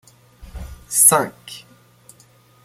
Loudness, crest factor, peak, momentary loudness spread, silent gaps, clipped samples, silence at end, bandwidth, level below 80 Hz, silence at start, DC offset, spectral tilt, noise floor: -14 LUFS; 22 dB; 0 dBFS; 26 LU; none; under 0.1%; 1.05 s; 16.5 kHz; -44 dBFS; 0.45 s; under 0.1%; -2 dB/octave; -52 dBFS